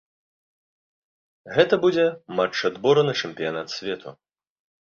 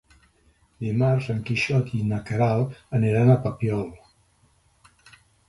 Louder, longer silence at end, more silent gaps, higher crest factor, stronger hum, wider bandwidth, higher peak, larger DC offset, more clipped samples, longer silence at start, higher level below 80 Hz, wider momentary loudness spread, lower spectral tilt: about the same, -23 LUFS vs -24 LUFS; second, 0.75 s vs 1.55 s; neither; about the same, 22 dB vs 18 dB; neither; second, 7.2 kHz vs 11.5 kHz; first, -2 dBFS vs -8 dBFS; neither; neither; first, 1.45 s vs 0.8 s; second, -66 dBFS vs -52 dBFS; about the same, 11 LU vs 9 LU; second, -5 dB/octave vs -8 dB/octave